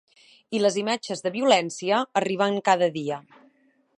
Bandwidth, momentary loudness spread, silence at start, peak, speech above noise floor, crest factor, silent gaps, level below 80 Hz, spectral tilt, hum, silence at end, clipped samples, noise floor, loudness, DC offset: 11.5 kHz; 10 LU; 0.5 s; -4 dBFS; 39 dB; 20 dB; none; -76 dBFS; -4 dB/octave; none; 0.8 s; under 0.1%; -63 dBFS; -24 LUFS; under 0.1%